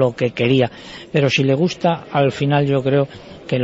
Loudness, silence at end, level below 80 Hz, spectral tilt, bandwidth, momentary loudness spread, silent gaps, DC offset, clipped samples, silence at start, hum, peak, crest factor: -18 LUFS; 0 s; -52 dBFS; -6.5 dB/octave; 7.8 kHz; 8 LU; none; under 0.1%; under 0.1%; 0 s; none; -2 dBFS; 16 dB